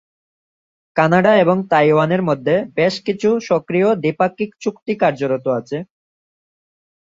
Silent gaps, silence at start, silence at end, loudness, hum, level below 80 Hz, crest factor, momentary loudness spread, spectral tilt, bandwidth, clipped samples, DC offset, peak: 4.82-4.86 s; 0.95 s; 1.15 s; -17 LUFS; none; -60 dBFS; 16 dB; 10 LU; -7 dB/octave; 7.8 kHz; under 0.1%; under 0.1%; 0 dBFS